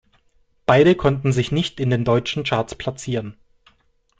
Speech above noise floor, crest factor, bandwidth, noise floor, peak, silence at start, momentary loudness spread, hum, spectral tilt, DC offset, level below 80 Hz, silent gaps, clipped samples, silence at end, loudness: 43 dB; 18 dB; 9.2 kHz; -62 dBFS; -2 dBFS; 0.7 s; 13 LU; none; -6.5 dB/octave; under 0.1%; -46 dBFS; none; under 0.1%; 0.85 s; -20 LUFS